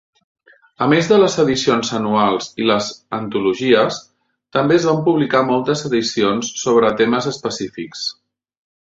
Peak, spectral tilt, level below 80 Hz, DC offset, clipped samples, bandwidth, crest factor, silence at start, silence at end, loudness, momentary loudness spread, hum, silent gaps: -2 dBFS; -4.5 dB/octave; -56 dBFS; under 0.1%; under 0.1%; 8 kHz; 16 dB; 0.8 s; 0.7 s; -17 LUFS; 11 LU; none; none